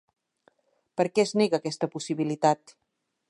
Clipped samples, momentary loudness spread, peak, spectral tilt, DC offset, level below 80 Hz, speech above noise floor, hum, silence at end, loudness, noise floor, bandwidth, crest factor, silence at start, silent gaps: under 0.1%; 8 LU; -8 dBFS; -5 dB/octave; under 0.1%; -78 dBFS; 41 dB; none; 0.75 s; -27 LUFS; -67 dBFS; 11.5 kHz; 20 dB; 0.95 s; none